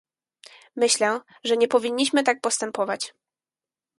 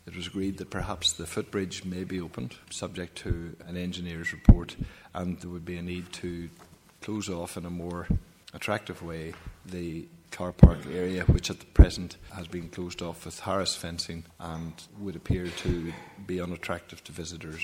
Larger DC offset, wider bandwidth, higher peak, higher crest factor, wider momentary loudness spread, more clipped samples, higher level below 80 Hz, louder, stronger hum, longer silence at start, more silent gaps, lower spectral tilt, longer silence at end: neither; second, 11.5 kHz vs 16 kHz; about the same, -6 dBFS vs -4 dBFS; second, 20 dB vs 26 dB; second, 9 LU vs 18 LU; neither; second, -76 dBFS vs -32 dBFS; first, -23 LUFS vs -30 LUFS; neither; first, 0.75 s vs 0.05 s; neither; second, -1.5 dB/octave vs -5.5 dB/octave; first, 0.9 s vs 0 s